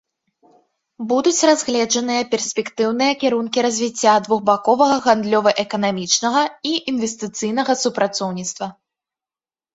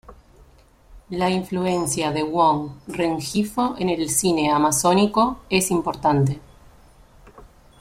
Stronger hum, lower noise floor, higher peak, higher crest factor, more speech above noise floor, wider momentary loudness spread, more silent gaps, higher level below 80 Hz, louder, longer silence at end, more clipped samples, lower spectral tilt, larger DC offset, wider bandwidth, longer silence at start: neither; first, under -90 dBFS vs -52 dBFS; about the same, -2 dBFS vs -4 dBFS; about the same, 18 dB vs 18 dB; first, over 72 dB vs 31 dB; about the same, 8 LU vs 7 LU; neither; second, -64 dBFS vs -48 dBFS; first, -18 LUFS vs -21 LUFS; first, 1.05 s vs 0.35 s; neither; second, -3 dB/octave vs -4.5 dB/octave; neither; second, 8 kHz vs 16.5 kHz; first, 1 s vs 0.1 s